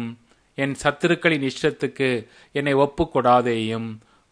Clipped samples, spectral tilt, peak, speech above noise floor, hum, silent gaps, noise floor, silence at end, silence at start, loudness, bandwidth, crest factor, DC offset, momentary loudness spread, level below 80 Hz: under 0.1%; -5.5 dB/octave; -4 dBFS; 19 dB; none; none; -41 dBFS; 0.35 s; 0 s; -22 LUFS; 10.5 kHz; 20 dB; under 0.1%; 12 LU; -50 dBFS